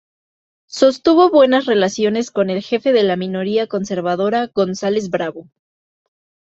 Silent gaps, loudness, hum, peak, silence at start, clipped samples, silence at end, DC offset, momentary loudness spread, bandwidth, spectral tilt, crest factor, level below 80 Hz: none; -16 LUFS; none; -2 dBFS; 0.7 s; under 0.1%; 1.15 s; under 0.1%; 9 LU; 8 kHz; -5.5 dB/octave; 16 dB; -60 dBFS